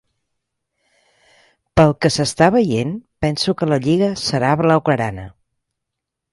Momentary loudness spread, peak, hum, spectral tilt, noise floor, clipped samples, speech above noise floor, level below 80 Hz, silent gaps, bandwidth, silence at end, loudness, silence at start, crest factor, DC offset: 8 LU; 0 dBFS; none; -5.5 dB/octave; -81 dBFS; under 0.1%; 64 dB; -44 dBFS; none; 11.5 kHz; 1.05 s; -17 LUFS; 1.75 s; 18 dB; under 0.1%